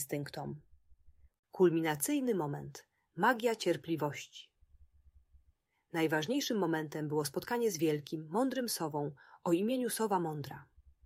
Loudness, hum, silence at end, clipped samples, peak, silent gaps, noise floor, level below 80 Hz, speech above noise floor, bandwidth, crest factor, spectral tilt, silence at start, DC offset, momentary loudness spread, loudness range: -34 LUFS; none; 0.4 s; under 0.1%; -16 dBFS; 1.39-1.43 s; -73 dBFS; -70 dBFS; 39 dB; 16 kHz; 20 dB; -4.5 dB/octave; 0 s; under 0.1%; 16 LU; 4 LU